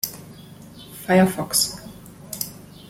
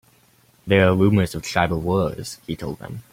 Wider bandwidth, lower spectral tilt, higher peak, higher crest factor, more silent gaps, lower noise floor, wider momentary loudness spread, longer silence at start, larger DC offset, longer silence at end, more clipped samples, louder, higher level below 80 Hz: about the same, 16.5 kHz vs 16 kHz; second, -4 dB/octave vs -6.5 dB/octave; about the same, -4 dBFS vs -2 dBFS; about the same, 20 dB vs 20 dB; neither; second, -42 dBFS vs -57 dBFS; first, 25 LU vs 16 LU; second, 0.05 s vs 0.65 s; neither; first, 0.3 s vs 0.1 s; neither; about the same, -21 LUFS vs -21 LUFS; second, -54 dBFS vs -46 dBFS